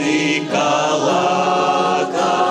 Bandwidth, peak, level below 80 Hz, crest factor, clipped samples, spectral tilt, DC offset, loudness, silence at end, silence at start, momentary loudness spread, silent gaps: 11.5 kHz; -4 dBFS; -66 dBFS; 12 dB; under 0.1%; -4 dB/octave; under 0.1%; -16 LUFS; 0 s; 0 s; 2 LU; none